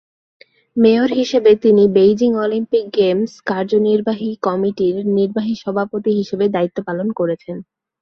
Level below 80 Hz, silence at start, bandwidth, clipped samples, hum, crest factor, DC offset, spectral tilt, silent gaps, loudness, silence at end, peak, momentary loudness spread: -58 dBFS; 0.75 s; 6.6 kHz; under 0.1%; none; 14 dB; under 0.1%; -7 dB/octave; none; -16 LUFS; 0.4 s; -2 dBFS; 9 LU